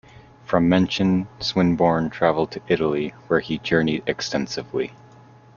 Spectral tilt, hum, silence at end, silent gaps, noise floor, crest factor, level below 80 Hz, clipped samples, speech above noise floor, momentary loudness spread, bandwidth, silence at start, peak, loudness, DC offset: -6 dB/octave; none; 0.65 s; none; -48 dBFS; 20 dB; -52 dBFS; under 0.1%; 27 dB; 8 LU; 7.2 kHz; 0.5 s; -2 dBFS; -22 LUFS; under 0.1%